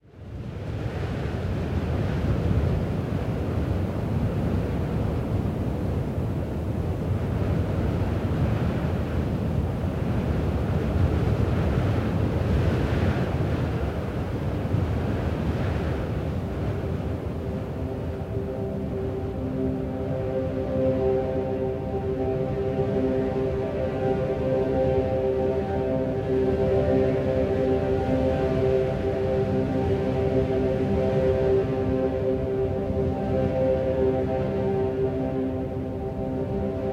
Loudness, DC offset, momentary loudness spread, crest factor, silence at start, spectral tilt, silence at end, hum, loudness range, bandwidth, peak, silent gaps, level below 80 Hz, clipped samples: -26 LUFS; under 0.1%; 6 LU; 14 dB; 0.15 s; -9 dB/octave; 0 s; none; 4 LU; 15 kHz; -10 dBFS; none; -36 dBFS; under 0.1%